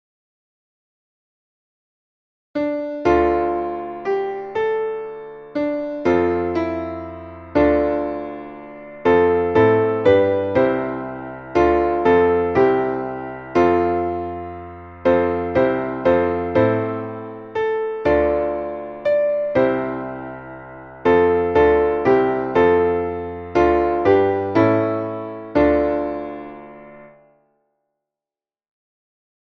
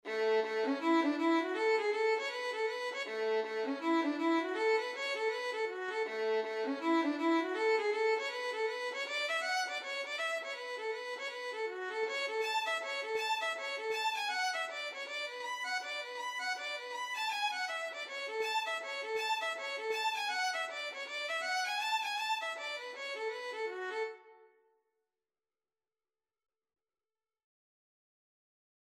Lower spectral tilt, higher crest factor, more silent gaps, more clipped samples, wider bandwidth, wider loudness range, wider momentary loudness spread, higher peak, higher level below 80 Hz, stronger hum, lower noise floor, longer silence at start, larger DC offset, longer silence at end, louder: first, -8.5 dB/octave vs -1 dB/octave; about the same, 18 dB vs 16 dB; neither; neither; second, 6.2 kHz vs 15.5 kHz; about the same, 6 LU vs 4 LU; first, 16 LU vs 7 LU; first, -2 dBFS vs -20 dBFS; first, -42 dBFS vs under -90 dBFS; neither; about the same, under -90 dBFS vs under -90 dBFS; first, 2.55 s vs 0.05 s; neither; second, 2.4 s vs 4.45 s; first, -19 LUFS vs -35 LUFS